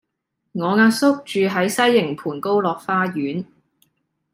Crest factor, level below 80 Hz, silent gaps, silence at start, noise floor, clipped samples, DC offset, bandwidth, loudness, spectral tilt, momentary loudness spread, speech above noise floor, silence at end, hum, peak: 16 dB; -66 dBFS; none; 0.55 s; -76 dBFS; under 0.1%; under 0.1%; 16 kHz; -19 LUFS; -5 dB/octave; 11 LU; 58 dB; 0.9 s; none; -4 dBFS